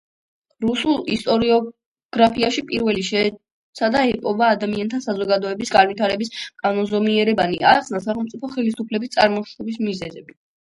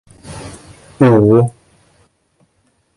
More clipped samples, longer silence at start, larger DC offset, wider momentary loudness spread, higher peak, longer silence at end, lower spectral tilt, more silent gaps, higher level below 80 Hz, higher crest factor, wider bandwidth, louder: neither; first, 0.6 s vs 0.25 s; neither; second, 9 LU vs 24 LU; about the same, 0 dBFS vs 0 dBFS; second, 0.4 s vs 1.45 s; second, -5 dB/octave vs -8.5 dB/octave; first, 1.86-1.95 s, 2.05-2.09 s, 3.52-3.73 s vs none; second, -54 dBFS vs -46 dBFS; about the same, 20 dB vs 16 dB; about the same, 11.5 kHz vs 11.5 kHz; second, -20 LUFS vs -12 LUFS